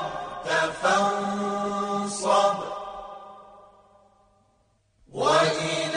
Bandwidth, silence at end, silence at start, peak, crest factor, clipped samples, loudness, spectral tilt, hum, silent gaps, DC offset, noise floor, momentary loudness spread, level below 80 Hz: 10 kHz; 0 s; 0 s; -8 dBFS; 18 dB; under 0.1%; -25 LUFS; -3.5 dB/octave; none; none; under 0.1%; -66 dBFS; 18 LU; -62 dBFS